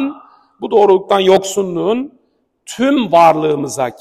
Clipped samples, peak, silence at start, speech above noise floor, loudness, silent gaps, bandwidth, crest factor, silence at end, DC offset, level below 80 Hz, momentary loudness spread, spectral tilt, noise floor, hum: under 0.1%; 0 dBFS; 0 s; 47 dB; -13 LUFS; none; 14.5 kHz; 14 dB; 0.1 s; under 0.1%; -56 dBFS; 13 LU; -5 dB/octave; -60 dBFS; none